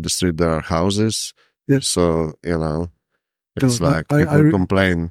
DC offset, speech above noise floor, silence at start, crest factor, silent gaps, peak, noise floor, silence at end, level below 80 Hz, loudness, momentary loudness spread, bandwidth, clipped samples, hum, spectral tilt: under 0.1%; 58 dB; 0 s; 18 dB; none; -2 dBFS; -76 dBFS; 0 s; -40 dBFS; -18 LUFS; 11 LU; 15.5 kHz; under 0.1%; none; -5.5 dB/octave